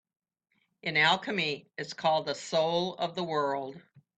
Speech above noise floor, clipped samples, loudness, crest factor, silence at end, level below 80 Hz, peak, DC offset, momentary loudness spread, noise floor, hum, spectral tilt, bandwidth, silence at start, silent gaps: 47 dB; under 0.1%; -29 LUFS; 20 dB; 0.4 s; -76 dBFS; -10 dBFS; under 0.1%; 13 LU; -77 dBFS; none; -4 dB/octave; 9 kHz; 0.85 s; none